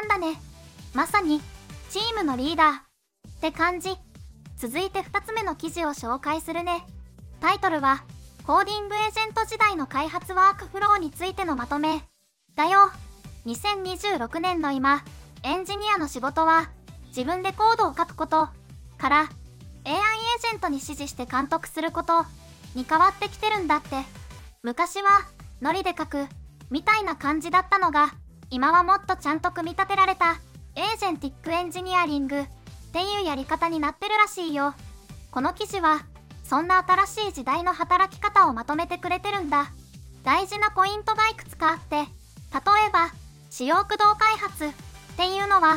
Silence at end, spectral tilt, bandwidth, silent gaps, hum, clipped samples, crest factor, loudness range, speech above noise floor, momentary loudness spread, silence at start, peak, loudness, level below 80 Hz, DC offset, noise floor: 0 s; -3.5 dB/octave; 16.5 kHz; none; none; under 0.1%; 18 dB; 4 LU; 26 dB; 13 LU; 0 s; -6 dBFS; -24 LUFS; -48 dBFS; under 0.1%; -50 dBFS